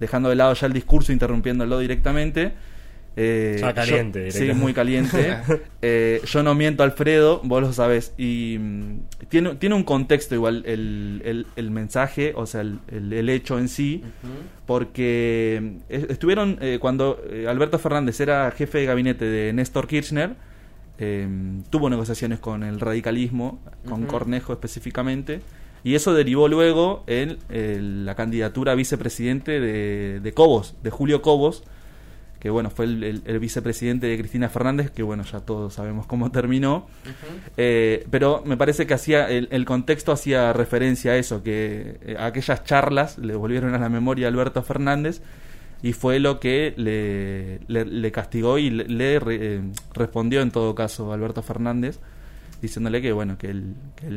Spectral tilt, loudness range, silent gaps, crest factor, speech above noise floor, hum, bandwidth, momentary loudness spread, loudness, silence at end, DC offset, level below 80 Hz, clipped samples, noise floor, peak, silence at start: -6.5 dB/octave; 5 LU; none; 20 dB; 22 dB; none; 16 kHz; 11 LU; -22 LUFS; 0 s; under 0.1%; -34 dBFS; under 0.1%; -43 dBFS; -2 dBFS; 0 s